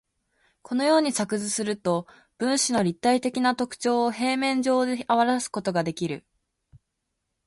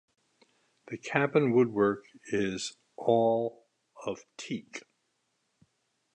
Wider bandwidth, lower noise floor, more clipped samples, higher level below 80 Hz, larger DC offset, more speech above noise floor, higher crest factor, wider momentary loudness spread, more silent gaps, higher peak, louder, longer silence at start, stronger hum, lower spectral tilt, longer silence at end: about the same, 11.5 kHz vs 10.5 kHz; about the same, -80 dBFS vs -77 dBFS; neither; about the same, -66 dBFS vs -70 dBFS; neither; first, 55 dB vs 49 dB; about the same, 18 dB vs 22 dB; second, 7 LU vs 16 LU; neither; about the same, -8 dBFS vs -8 dBFS; first, -25 LUFS vs -30 LUFS; second, 0.7 s vs 0.9 s; neither; second, -4 dB/octave vs -5.5 dB/octave; about the same, 1.3 s vs 1.35 s